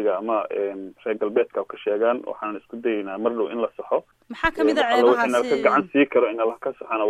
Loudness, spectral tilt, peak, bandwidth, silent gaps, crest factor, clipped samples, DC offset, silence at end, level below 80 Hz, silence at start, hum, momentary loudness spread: -23 LUFS; -5 dB/octave; -4 dBFS; 13 kHz; none; 18 dB; under 0.1%; under 0.1%; 0 s; -52 dBFS; 0 s; none; 11 LU